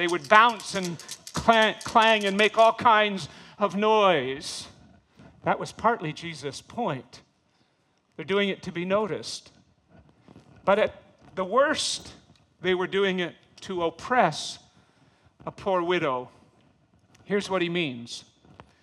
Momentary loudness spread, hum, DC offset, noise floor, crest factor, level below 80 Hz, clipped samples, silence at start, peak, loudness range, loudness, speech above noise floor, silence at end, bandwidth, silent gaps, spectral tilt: 18 LU; none; under 0.1%; -68 dBFS; 24 dB; -62 dBFS; under 0.1%; 0 s; -2 dBFS; 10 LU; -25 LUFS; 44 dB; 0.6 s; 13 kHz; none; -4 dB/octave